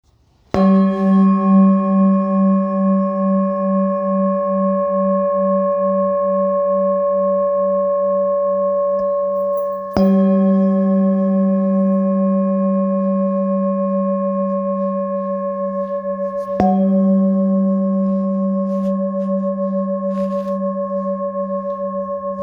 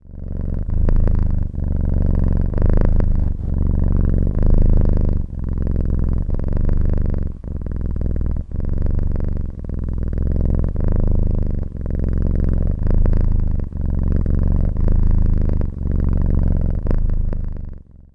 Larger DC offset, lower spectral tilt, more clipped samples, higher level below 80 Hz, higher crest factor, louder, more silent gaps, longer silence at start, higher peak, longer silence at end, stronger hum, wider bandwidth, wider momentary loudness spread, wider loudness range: neither; about the same, -11 dB/octave vs -11.5 dB/octave; neither; second, -52 dBFS vs -18 dBFS; about the same, 16 dB vs 16 dB; first, -17 LUFS vs -22 LUFS; neither; first, 0.55 s vs 0.05 s; about the same, 0 dBFS vs 0 dBFS; second, 0 s vs 0.3 s; neither; first, 5.2 kHz vs 2.1 kHz; about the same, 8 LU vs 7 LU; about the same, 5 LU vs 4 LU